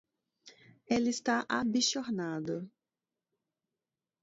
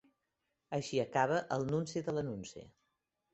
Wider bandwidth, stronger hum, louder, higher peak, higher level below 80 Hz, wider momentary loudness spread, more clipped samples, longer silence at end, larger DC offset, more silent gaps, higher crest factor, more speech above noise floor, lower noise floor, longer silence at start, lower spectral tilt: about the same, 8 kHz vs 8 kHz; neither; first, -32 LUFS vs -36 LUFS; about the same, -16 dBFS vs -16 dBFS; about the same, -72 dBFS vs -70 dBFS; second, 10 LU vs 13 LU; neither; first, 1.55 s vs 0.65 s; neither; neither; about the same, 20 dB vs 22 dB; first, over 58 dB vs 50 dB; first, under -90 dBFS vs -85 dBFS; second, 0.45 s vs 0.7 s; second, -3.5 dB/octave vs -5 dB/octave